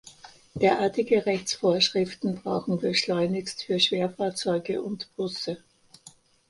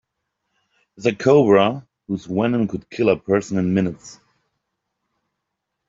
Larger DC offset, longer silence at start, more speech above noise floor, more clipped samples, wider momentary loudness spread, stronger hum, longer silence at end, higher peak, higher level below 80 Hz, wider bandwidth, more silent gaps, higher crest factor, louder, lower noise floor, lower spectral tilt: neither; second, 0.05 s vs 1 s; second, 28 dB vs 60 dB; neither; second, 10 LU vs 14 LU; neither; second, 0.4 s vs 1.75 s; second, -8 dBFS vs -2 dBFS; second, -64 dBFS vs -58 dBFS; first, 11.5 kHz vs 7.8 kHz; neither; about the same, 20 dB vs 18 dB; second, -26 LUFS vs -19 LUFS; second, -54 dBFS vs -79 dBFS; second, -4.5 dB/octave vs -7 dB/octave